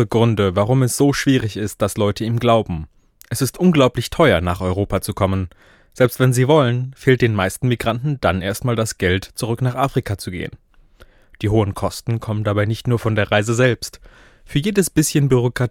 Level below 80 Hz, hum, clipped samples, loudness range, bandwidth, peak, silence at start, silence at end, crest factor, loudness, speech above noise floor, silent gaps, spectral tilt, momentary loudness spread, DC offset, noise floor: -42 dBFS; none; under 0.1%; 5 LU; 17 kHz; 0 dBFS; 0 s; 0 s; 18 dB; -18 LUFS; 31 dB; none; -5.5 dB/octave; 9 LU; under 0.1%; -48 dBFS